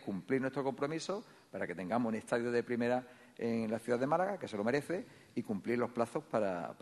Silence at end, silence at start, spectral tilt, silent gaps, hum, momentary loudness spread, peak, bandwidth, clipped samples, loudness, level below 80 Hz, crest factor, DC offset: 0.1 s; 0 s; -6 dB/octave; none; none; 8 LU; -18 dBFS; 12 kHz; under 0.1%; -36 LUFS; -76 dBFS; 18 dB; under 0.1%